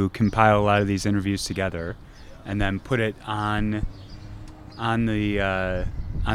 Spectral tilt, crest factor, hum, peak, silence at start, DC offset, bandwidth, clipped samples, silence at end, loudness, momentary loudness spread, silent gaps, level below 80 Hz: -6 dB/octave; 22 dB; none; -2 dBFS; 0 s; under 0.1%; 14 kHz; under 0.1%; 0 s; -24 LUFS; 22 LU; none; -36 dBFS